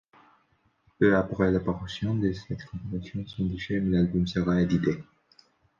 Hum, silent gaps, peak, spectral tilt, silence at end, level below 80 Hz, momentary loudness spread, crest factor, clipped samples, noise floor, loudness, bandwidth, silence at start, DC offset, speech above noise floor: none; none; -8 dBFS; -8 dB/octave; 0.75 s; -48 dBFS; 13 LU; 20 dB; under 0.1%; -68 dBFS; -27 LUFS; 7.2 kHz; 1 s; under 0.1%; 42 dB